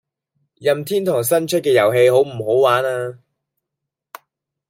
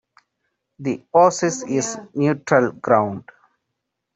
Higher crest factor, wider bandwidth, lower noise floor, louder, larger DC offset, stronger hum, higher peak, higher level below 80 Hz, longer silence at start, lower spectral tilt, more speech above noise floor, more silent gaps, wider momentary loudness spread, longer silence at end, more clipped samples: about the same, 16 dB vs 18 dB; first, 16.5 kHz vs 8.4 kHz; about the same, -82 dBFS vs -79 dBFS; first, -17 LUFS vs -20 LUFS; neither; neither; about the same, -2 dBFS vs -2 dBFS; about the same, -66 dBFS vs -64 dBFS; second, 0.6 s vs 0.8 s; about the same, -4.5 dB/octave vs -5 dB/octave; first, 66 dB vs 59 dB; neither; about the same, 9 LU vs 11 LU; first, 1.55 s vs 0.95 s; neither